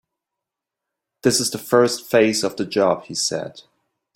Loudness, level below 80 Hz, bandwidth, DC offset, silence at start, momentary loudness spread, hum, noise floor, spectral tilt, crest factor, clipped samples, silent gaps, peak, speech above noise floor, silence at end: -19 LUFS; -64 dBFS; 16.5 kHz; under 0.1%; 1.25 s; 6 LU; none; -84 dBFS; -3.5 dB/octave; 20 dB; under 0.1%; none; -2 dBFS; 65 dB; 0.55 s